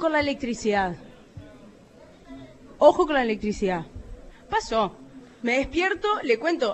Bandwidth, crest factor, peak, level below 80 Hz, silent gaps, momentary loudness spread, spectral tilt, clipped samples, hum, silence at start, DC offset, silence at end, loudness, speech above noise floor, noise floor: 8.4 kHz; 22 dB; -4 dBFS; -48 dBFS; none; 25 LU; -5 dB/octave; under 0.1%; none; 0 s; under 0.1%; 0 s; -24 LUFS; 27 dB; -50 dBFS